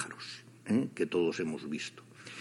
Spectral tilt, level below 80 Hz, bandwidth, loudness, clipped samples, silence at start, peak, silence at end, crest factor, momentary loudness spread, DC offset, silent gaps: -5.5 dB/octave; -76 dBFS; 11.5 kHz; -34 LUFS; under 0.1%; 0 s; -18 dBFS; 0 s; 16 dB; 15 LU; under 0.1%; none